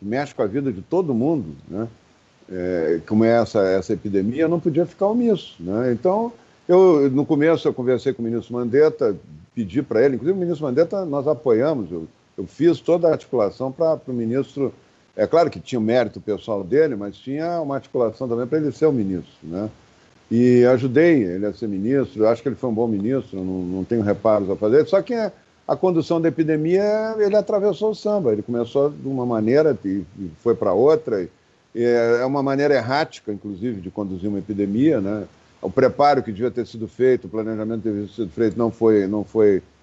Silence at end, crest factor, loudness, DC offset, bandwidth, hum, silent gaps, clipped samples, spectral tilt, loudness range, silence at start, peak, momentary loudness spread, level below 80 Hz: 0.2 s; 16 dB; -20 LUFS; under 0.1%; 7.8 kHz; none; none; under 0.1%; -8 dB/octave; 3 LU; 0 s; -4 dBFS; 12 LU; -58 dBFS